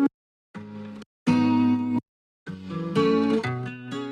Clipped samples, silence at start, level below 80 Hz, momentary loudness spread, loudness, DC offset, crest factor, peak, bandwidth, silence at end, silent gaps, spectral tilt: under 0.1%; 0 s; -68 dBFS; 20 LU; -25 LUFS; under 0.1%; 16 dB; -10 dBFS; 9.6 kHz; 0 s; 0.14-0.54 s, 1.06-1.26 s, 2.08-2.46 s; -7.5 dB/octave